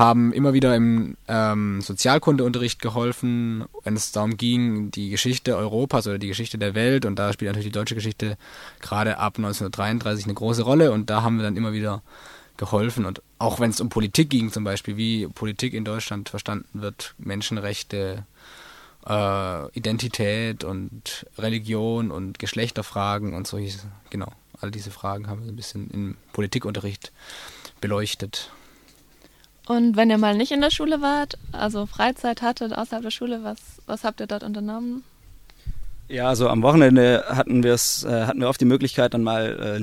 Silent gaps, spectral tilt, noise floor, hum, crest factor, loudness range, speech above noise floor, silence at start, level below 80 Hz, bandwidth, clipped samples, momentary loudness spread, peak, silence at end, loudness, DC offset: none; -5.5 dB/octave; -54 dBFS; none; 22 dB; 11 LU; 31 dB; 0 s; -48 dBFS; 16.5 kHz; under 0.1%; 15 LU; 0 dBFS; 0 s; -23 LUFS; under 0.1%